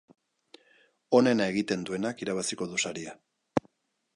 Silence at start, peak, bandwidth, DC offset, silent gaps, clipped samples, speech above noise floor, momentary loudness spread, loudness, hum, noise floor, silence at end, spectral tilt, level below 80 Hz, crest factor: 1.1 s; -8 dBFS; 11.5 kHz; under 0.1%; none; under 0.1%; 39 dB; 10 LU; -29 LUFS; none; -67 dBFS; 0.55 s; -4 dB/octave; -68 dBFS; 22 dB